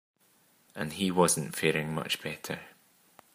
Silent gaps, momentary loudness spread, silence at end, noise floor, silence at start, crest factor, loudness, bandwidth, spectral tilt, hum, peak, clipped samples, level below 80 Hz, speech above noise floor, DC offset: none; 14 LU; 0.65 s; -66 dBFS; 0.75 s; 22 dB; -30 LUFS; 15.5 kHz; -3.5 dB/octave; none; -10 dBFS; under 0.1%; -68 dBFS; 36 dB; under 0.1%